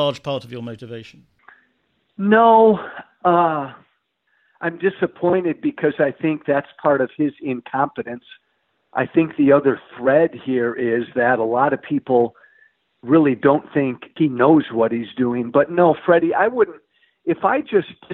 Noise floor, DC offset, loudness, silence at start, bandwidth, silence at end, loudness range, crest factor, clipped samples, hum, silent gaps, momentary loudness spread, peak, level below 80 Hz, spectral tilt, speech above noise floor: -68 dBFS; under 0.1%; -18 LUFS; 0 s; 6.2 kHz; 0 s; 4 LU; 16 dB; under 0.1%; none; none; 13 LU; -2 dBFS; -62 dBFS; -8.5 dB/octave; 50 dB